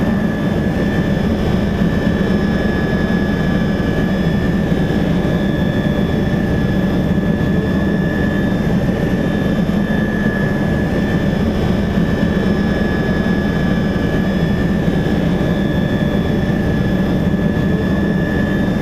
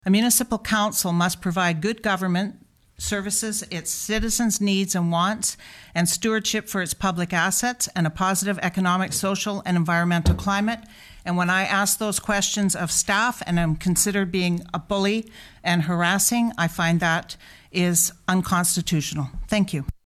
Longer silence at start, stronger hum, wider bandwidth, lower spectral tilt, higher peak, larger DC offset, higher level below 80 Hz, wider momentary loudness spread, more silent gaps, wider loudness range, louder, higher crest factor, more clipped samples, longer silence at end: about the same, 0 s vs 0.05 s; neither; second, 13 kHz vs 14.5 kHz; first, -8 dB/octave vs -3.5 dB/octave; about the same, -4 dBFS vs -4 dBFS; neither; first, -28 dBFS vs -42 dBFS; second, 1 LU vs 7 LU; neither; about the same, 0 LU vs 2 LU; first, -16 LUFS vs -22 LUFS; second, 12 dB vs 18 dB; neither; second, 0 s vs 0.15 s